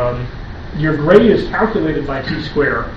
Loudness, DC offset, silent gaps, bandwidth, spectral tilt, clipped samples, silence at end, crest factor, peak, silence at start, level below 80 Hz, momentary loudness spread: -15 LUFS; under 0.1%; none; 7 kHz; -8 dB/octave; 0.2%; 0 s; 16 dB; 0 dBFS; 0 s; -30 dBFS; 17 LU